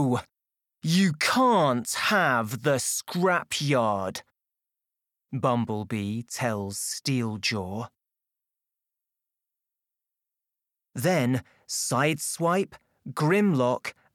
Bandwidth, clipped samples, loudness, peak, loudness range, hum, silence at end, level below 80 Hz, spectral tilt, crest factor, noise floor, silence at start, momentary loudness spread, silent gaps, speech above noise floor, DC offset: 18.5 kHz; under 0.1%; -26 LUFS; -10 dBFS; 9 LU; none; 0.25 s; -68 dBFS; -4.5 dB/octave; 18 dB; -88 dBFS; 0 s; 13 LU; none; 62 dB; under 0.1%